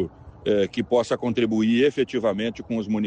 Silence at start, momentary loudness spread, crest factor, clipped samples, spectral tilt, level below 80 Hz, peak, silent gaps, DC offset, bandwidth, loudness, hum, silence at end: 0 s; 9 LU; 14 dB; under 0.1%; -6 dB/octave; -54 dBFS; -10 dBFS; none; under 0.1%; 9.2 kHz; -23 LUFS; none; 0 s